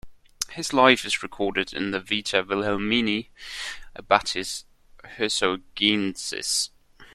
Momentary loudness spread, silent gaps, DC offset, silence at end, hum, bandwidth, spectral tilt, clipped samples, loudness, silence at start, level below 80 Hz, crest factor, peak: 14 LU; none; under 0.1%; 0.1 s; none; 14 kHz; -2.5 dB/octave; under 0.1%; -24 LUFS; 0.05 s; -54 dBFS; 24 dB; -2 dBFS